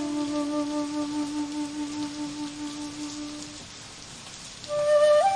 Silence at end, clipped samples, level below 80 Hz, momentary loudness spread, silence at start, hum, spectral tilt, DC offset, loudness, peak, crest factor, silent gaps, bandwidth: 0 s; under 0.1%; -60 dBFS; 18 LU; 0 s; none; -4 dB/octave; under 0.1%; -28 LUFS; -12 dBFS; 16 dB; none; 10.5 kHz